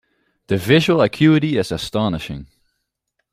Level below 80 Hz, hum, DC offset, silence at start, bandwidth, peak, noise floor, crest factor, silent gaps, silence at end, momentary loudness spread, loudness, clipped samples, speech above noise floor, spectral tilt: -48 dBFS; none; under 0.1%; 0.5 s; 15.5 kHz; -2 dBFS; -74 dBFS; 18 dB; none; 0.9 s; 13 LU; -17 LUFS; under 0.1%; 58 dB; -6.5 dB/octave